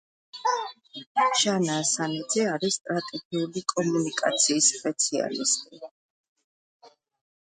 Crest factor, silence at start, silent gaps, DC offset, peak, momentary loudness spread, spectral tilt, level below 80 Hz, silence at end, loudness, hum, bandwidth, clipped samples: 20 dB; 0.35 s; 1.06-1.15 s, 2.81-2.85 s, 3.25-3.31 s, 5.91-6.36 s, 6.44-6.80 s; under 0.1%; -8 dBFS; 10 LU; -2.5 dB/octave; -76 dBFS; 0.6 s; -25 LUFS; none; 9.6 kHz; under 0.1%